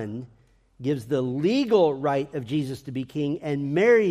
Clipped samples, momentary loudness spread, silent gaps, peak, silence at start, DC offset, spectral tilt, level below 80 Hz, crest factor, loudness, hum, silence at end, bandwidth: under 0.1%; 13 LU; none; -8 dBFS; 0 s; under 0.1%; -7 dB/octave; -62 dBFS; 16 dB; -25 LUFS; none; 0 s; 13 kHz